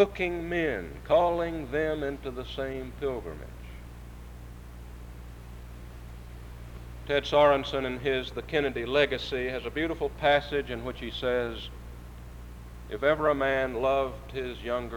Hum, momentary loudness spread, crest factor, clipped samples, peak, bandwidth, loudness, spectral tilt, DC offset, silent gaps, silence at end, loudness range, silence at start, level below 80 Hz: 60 Hz at -45 dBFS; 21 LU; 20 dB; under 0.1%; -10 dBFS; over 20 kHz; -29 LUFS; -6 dB/octave; under 0.1%; none; 0 s; 13 LU; 0 s; -44 dBFS